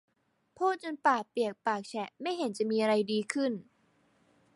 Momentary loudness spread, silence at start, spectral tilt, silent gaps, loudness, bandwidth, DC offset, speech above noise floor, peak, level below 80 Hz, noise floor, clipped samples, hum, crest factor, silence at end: 8 LU; 0.6 s; -4.5 dB/octave; none; -31 LUFS; 11.5 kHz; under 0.1%; 38 dB; -12 dBFS; -82 dBFS; -69 dBFS; under 0.1%; none; 20 dB; 0.95 s